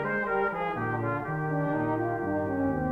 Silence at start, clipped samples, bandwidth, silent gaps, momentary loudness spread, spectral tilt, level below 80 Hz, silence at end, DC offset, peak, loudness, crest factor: 0 s; under 0.1%; 5.6 kHz; none; 2 LU; -9.5 dB/octave; -54 dBFS; 0 s; under 0.1%; -16 dBFS; -29 LUFS; 12 dB